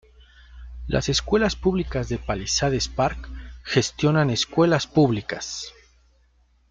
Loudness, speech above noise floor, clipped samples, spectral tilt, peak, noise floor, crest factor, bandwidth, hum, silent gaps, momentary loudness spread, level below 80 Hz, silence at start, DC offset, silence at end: -23 LUFS; 38 dB; under 0.1%; -4.5 dB/octave; -6 dBFS; -61 dBFS; 18 dB; 9.4 kHz; none; none; 16 LU; -40 dBFS; 0.5 s; under 0.1%; 1 s